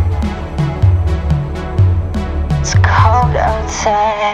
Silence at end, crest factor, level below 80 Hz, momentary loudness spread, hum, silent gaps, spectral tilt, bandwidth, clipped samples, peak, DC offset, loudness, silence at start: 0 s; 12 dB; -20 dBFS; 9 LU; none; none; -6 dB/octave; 8.4 kHz; under 0.1%; 0 dBFS; under 0.1%; -14 LUFS; 0 s